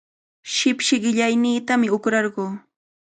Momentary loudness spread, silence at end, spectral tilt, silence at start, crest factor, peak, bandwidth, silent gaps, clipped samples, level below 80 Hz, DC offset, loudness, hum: 11 LU; 0.55 s; -3 dB/octave; 0.45 s; 16 dB; -6 dBFS; 9.4 kHz; none; under 0.1%; -70 dBFS; under 0.1%; -20 LUFS; none